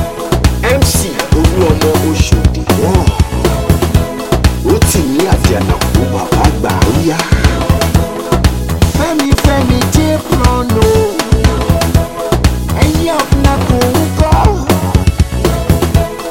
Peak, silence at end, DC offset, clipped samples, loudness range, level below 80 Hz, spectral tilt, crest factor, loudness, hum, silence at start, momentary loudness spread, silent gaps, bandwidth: 0 dBFS; 0 s; under 0.1%; 0.3%; 1 LU; -16 dBFS; -5.5 dB/octave; 10 dB; -11 LUFS; none; 0 s; 3 LU; none; 17 kHz